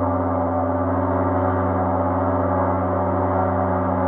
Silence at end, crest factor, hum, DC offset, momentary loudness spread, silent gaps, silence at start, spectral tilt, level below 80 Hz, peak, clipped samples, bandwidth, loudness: 0 s; 12 dB; none; under 0.1%; 1 LU; none; 0 s; -12.5 dB/octave; -48 dBFS; -8 dBFS; under 0.1%; 3.4 kHz; -21 LUFS